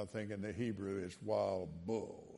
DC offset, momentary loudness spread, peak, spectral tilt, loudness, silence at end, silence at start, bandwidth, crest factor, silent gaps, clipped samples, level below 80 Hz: under 0.1%; 6 LU; -24 dBFS; -7 dB/octave; -41 LUFS; 0 s; 0 s; 11.5 kHz; 18 dB; none; under 0.1%; -72 dBFS